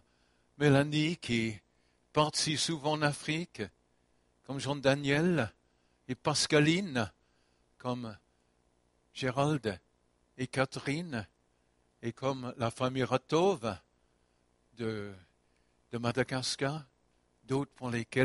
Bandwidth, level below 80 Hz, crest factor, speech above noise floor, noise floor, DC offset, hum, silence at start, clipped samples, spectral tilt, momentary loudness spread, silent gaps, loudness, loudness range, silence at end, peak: 11.5 kHz; -66 dBFS; 22 dB; 41 dB; -73 dBFS; under 0.1%; 60 Hz at -60 dBFS; 0.6 s; under 0.1%; -5 dB/octave; 15 LU; none; -32 LUFS; 7 LU; 0 s; -10 dBFS